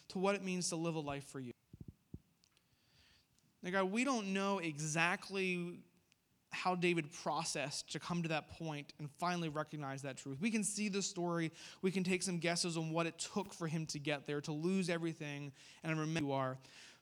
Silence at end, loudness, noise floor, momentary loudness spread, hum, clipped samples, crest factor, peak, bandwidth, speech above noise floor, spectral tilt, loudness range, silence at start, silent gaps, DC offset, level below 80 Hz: 0.05 s; -39 LUFS; -76 dBFS; 13 LU; none; under 0.1%; 22 dB; -18 dBFS; 19.5 kHz; 37 dB; -4.5 dB/octave; 4 LU; 0.1 s; none; under 0.1%; -76 dBFS